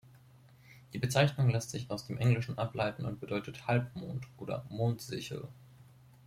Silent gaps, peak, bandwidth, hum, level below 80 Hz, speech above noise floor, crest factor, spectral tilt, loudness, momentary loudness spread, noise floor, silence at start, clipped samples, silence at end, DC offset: none; -14 dBFS; 15 kHz; none; -64 dBFS; 26 dB; 20 dB; -6 dB/octave; -34 LUFS; 13 LU; -59 dBFS; 0.15 s; under 0.1%; 0.4 s; under 0.1%